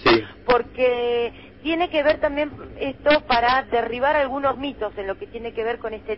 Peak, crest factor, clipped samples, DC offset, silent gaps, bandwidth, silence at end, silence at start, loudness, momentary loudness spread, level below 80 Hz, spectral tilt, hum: -4 dBFS; 18 dB; under 0.1%; 0.2%; none; 5.8 kHz; 0 s; 0 s; -22 LUFS; 12 LU; -44 dBFS; -7 dB/octave; none